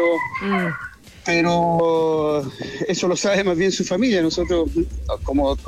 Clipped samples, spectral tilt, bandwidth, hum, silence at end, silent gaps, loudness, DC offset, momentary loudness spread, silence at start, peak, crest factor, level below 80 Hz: under 0.1%; -5 dB/octave; 13.5 kHz; none; 0 s; none; -20 LUFS; under 0.1%; 9 LU; 0 s; -8 dBFS; 12 dB; -36 dBFS